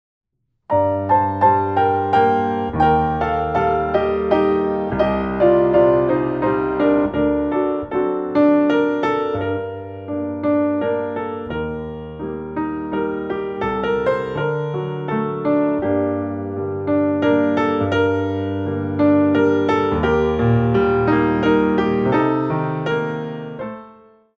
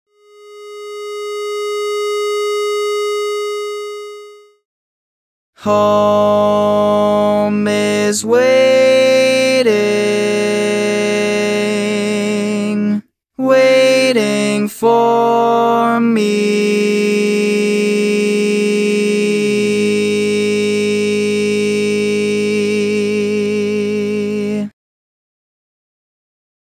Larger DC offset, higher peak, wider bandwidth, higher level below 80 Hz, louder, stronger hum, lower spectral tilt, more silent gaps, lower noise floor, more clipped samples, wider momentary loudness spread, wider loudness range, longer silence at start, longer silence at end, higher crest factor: neither; about the same, -2 dBFS vs 0 dBFS; second, 6.6 kHz vs 16 kHz; first, -42 dBFS vs -62 dBFS; second, -19 LUFS vs -14 LUFS; neither; first, -9 dB/octave vs -4.5 dB/octave; second, none vs 4.65-5.53 s; first, -47 dBFS vs -41 dBFS; neither; about the same, 10 LU vs 9 LU; about the same, 6 LU vs 7 LU; first, 0.7 s vs 0.45 s; second, 0.45 s vs 1.95 s; about the same, 16 dB vs 14 dB